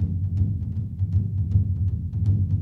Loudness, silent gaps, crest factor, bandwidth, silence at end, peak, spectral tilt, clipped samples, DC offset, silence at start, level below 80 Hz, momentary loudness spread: -25 LUFS; none; 14 dB; 0.9 kHz; 0 s; -10 dBFS; -12 dB/octave; under 0.1%; under 0.1%; 0 s; -34 dBFS; 5 LU